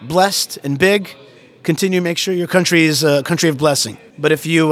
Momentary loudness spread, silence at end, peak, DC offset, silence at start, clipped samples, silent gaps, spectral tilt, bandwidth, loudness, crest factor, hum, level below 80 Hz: 8 LU; 0 s; 0 dBFS; under 0.1%; 0 s; under 0.1%; none; -4 dB/octave; 16.5 kHz; -15 LUFS; 16 dB; none; -56 dBFS